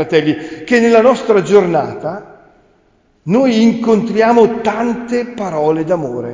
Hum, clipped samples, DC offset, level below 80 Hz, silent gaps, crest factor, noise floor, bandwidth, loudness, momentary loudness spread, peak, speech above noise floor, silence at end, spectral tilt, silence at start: none; under 0.1%; under 0.1%; -52 dBFS; none; 14 dB; -54 dBFS; 7.6 kHz; -13 LUFS; 11 LU; 0 dBFS; 42 dB; 0 s; -6.5 dB/octave; 0 s